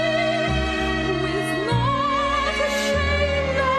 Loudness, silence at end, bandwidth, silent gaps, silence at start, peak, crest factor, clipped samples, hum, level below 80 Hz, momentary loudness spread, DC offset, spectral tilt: -21 LUFS; 0 s; 13 kHz; none; 0 s; -10 dBFS; 12 dB; under 0.1%; none; -32 dBFS; 2 LU; under 0.1%; -5 dB/octave